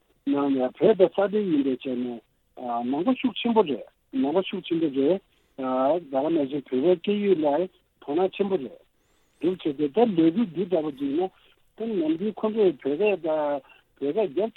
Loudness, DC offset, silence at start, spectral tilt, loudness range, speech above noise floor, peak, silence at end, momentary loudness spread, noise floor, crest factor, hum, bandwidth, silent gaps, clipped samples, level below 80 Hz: -25 LUFS; under 0.1%; 0.25 s; -9 dB/octave; 2 LU; 41 dB; -6 dBFS; 0.05 s; 10 LU; -66 dBFS; 20 dB; none; 4.2 kHz; none; under 0.1%; -70 dBFS